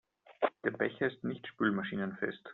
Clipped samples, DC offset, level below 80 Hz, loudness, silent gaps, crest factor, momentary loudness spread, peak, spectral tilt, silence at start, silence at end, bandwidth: under 0.1%; under 0.1%; -74 dBFS; -35 LUFS; none; 20 dB; 6 LU; -16 dBFS; -4.5 dB/octave; 0.3 s; 0 s; 4.2 kHz